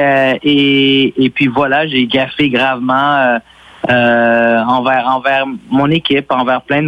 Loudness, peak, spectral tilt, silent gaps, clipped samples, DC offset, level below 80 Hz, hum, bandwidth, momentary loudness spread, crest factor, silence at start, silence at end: -12 LUFS; -2 dBFS; -7 dB/octave; none; under 0.1%; under 0.1%; -50 dBFS; none; 6.4 kHz; 4 LU; 10 dB; 0 s; 0 s